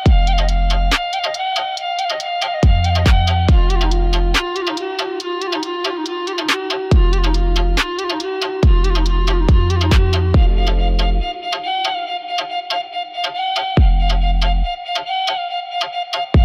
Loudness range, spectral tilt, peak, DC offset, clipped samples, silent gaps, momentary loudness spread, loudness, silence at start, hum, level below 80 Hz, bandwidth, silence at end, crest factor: 3 LU; -5.5 dB/octave; -4 dBFS; under 0.1%; under 0.1%; none; 8 LU; -18 LUFS; 0 s; none; -18 dBFS; 9.6 kHz; 0 s; 10 dB